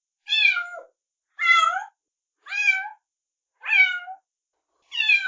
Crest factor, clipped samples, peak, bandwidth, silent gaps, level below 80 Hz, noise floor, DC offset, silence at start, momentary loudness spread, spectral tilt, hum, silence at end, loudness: 18 dB; under 0.1%; -6 dBFS; 7.6 kHz; none; -86 dBFS; -87 dBFS; under 0.1%; 0.3 s; 18 LU; 5 dB/octave; none; 0 s; -20 LUFS